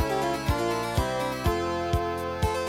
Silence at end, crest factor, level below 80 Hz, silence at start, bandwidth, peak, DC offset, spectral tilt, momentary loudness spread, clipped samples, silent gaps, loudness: 0 s; 14 dB; -36 dBFS; 0 s; 16.5 kHz; -12 dBFS; under 0.1%; -5.5 dB/octave; 2 LU; under 0.1%; none; -28 LUFS